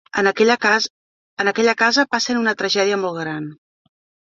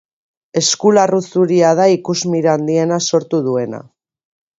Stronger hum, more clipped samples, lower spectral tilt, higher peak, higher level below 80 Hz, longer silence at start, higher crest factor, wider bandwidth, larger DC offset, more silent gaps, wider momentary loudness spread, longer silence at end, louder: neither; neither; second, -3 dB/octave vs -4.5 dB/octave; about the same, -2 dBFS vs 0 dBFS; about the same, -66 dBFS vs -62 dBFS; second, 0.15 s vs 0.55 s; about the same, 18 dB vs 16 dB; about the same, 7.8 kHz vs 8 kHz; neither; first, 0.90-1.37 s vs none; first, 11 LU vs 8 LU; about the same, 0.75 s vs 0.75 s; second, -18 LUFS vs -14 LUFS